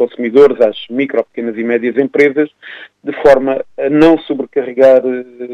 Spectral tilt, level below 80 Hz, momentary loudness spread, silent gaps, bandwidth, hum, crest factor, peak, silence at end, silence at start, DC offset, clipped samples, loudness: -7 dB/octave; -46 dBFS; 12 LU; none; 7.8 kHz; none; 12 dB; 0 dBFS; 0 s; 0 s; under 0.1%; under 0.1%; -12 LUFS